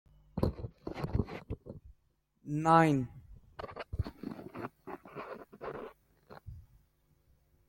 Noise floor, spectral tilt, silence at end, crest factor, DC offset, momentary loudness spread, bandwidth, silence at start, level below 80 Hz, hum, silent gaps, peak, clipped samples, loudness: -74 dBFS; -7.5 dB/octave; 1.05 s; 26 dB; under 0.1%; 27 LU; 16.5 kHz; 0.35 s; -52 dBFS; none; none; -10 dBFS; under 0.1%; -35 LUFS